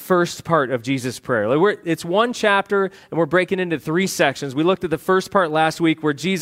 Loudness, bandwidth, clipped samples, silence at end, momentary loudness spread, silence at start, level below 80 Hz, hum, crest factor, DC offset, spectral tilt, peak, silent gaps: -20 LUFS; 16 kHz; under 0.1%; 0 s; 5 LU; 0 s; -60 dBFS; none; 18 dB; under 0.1%; -5 dB/octave; -2 dBFS; none